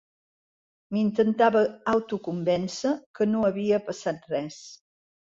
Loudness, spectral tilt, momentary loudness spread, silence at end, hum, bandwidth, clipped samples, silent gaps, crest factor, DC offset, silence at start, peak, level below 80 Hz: -26 LUFS; -6 dB/octave; 10 LU; 0.45 s; none; 7.8 kHz; under 0.1%; 3.06-3.14 s; 20 dB; under 0.1%; 0.9 s; -8 dBFS; -66 dBFS